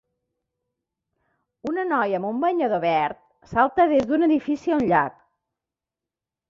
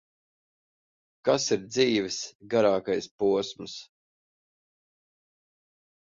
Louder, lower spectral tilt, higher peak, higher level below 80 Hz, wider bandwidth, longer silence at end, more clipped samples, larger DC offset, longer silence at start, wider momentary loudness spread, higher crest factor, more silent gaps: first, -22 LUFS vs -27 LUFS; first, -7 dB/octave vs -4 dB/octave; first, -4 dBFS vs -10 dBFS; first, -58 dBFS vs -68 dBFS; about the same, 7.4 kHz vs 7.6 kHz; second, 1.4 s vs 2.2 s; neither; neither; first, 1.65 s vs 1.25 s; about the same, 10 LU vs 12 LU; about the same, 20 dB vs 20 dB; second, none vs 2.35-2.40 s, 3.11-3.18 s